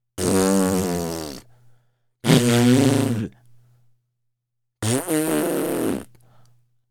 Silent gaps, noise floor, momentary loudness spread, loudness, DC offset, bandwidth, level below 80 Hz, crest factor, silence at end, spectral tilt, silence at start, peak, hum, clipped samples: none; -78 dBFS; 15 LU; -21 LUFS; under 0.1%; 19.5 kHz; -52 dBFS; 22 dB; 0.85 s; -5 dB/octave; 0.15 s; 0 dBFS; none; under 0.1%